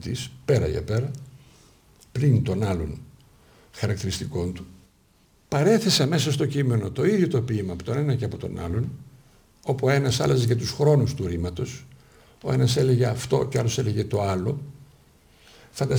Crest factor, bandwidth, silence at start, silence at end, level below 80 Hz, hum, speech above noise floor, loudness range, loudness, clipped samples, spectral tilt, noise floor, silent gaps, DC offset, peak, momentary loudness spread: 18 dB; over 20 kHz; 0 s; 0 s; -46 dBFS; none; 37 dB; 5 LU; -24 LUFS; under 0.1%; -6 dB/octave; -60 dBFS; none; under 0.1%; -8 dBFS; 13 LU